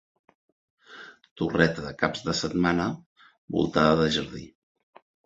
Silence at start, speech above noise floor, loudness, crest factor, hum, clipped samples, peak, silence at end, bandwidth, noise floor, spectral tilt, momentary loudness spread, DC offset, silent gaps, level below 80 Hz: 0.9 s; 23 dB; -25 LUFS; 26 dB; none; under 0.1%; -2 dBFS; 0.8 s; 8 kHz; -48 dBFS; -5.5 dB/octave; 23 LU; under 0.1%; 1.31-1.36 s, 3.06-3.16 s, 3.38-3.48 s; -52 dBFS